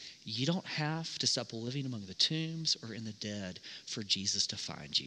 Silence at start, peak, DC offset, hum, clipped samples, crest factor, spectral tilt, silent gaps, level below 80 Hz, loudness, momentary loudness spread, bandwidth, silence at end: 0 s; -14 dBFS; under 0.1%; none; under 0.1%; 22 dB; -3 dB/octave; none; -76 dBFS; -34 LUFS; 11 LU; 11 kHz; 0 s